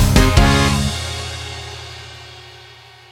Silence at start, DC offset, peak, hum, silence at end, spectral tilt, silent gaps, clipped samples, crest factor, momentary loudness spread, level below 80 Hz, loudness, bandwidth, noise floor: 0 s; under 0.1%; 0 dBFS; none; 0.55 s; -4.5 dB/octave; none; under 0.1%; 18 dB; 23 LU; -22 dBFS; -16 LUFS; 18 kHz; -42 dBFS